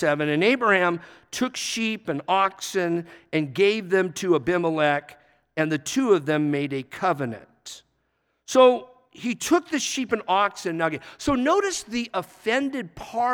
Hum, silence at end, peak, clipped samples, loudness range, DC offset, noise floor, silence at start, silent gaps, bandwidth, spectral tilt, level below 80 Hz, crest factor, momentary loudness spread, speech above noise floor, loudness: none; 0 s; -4 dBFS; under 0.1%; 2 LU; under 0.1%; -72 dBFS; 0 s; none; 19.5 kHz; -4 dB/octave; -58 dBFS; 20 dB; 11 LU; 49 dB; -24 LUFS